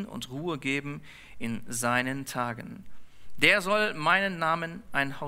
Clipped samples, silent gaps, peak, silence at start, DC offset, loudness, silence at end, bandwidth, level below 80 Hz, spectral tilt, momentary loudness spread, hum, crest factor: under 0.1%; none; -6 dBFS; 0 s; under 0.1%; -27 LUFS; 0 s; 16 kHz; -58 dBFS; -3.5 dB/octave; 17 LU; none; 24 dB